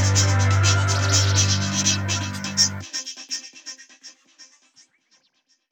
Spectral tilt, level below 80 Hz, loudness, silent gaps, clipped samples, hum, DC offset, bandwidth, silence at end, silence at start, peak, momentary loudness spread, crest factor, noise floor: -3 dB/octave; -62 dBFS; -20 LUFS; none; under 0.1%; none; under 0.1%; 16.5 kHz; 1.25 s; 0 s; -4 dBFS; 14 LU; 20 dB; -66 dBFS